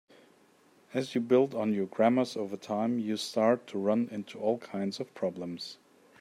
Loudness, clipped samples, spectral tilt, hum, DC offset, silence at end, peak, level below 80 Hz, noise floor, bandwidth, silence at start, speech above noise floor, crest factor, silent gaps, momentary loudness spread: -31 LUFS; under 0.1%; -6 dB/octave; none; under 0.1%; 0.45 s; -12 dBFS; -80 dBFS; -63 dBFS; 13 kHz; 0.9 s; 33 dB; 18 dB; none; 11 LU